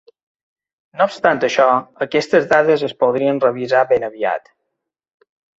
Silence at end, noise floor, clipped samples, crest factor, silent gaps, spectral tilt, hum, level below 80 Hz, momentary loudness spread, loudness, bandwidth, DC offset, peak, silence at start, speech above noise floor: 1.2 s; -78 dBFS; under 0.1%; 18 dB; none; -5 dB/octave; none; -60 dBFS; 7 LU; -16 LUFS; 8 kHz; under 0.1%; 0 dBFS; 0.95 s; 62 dB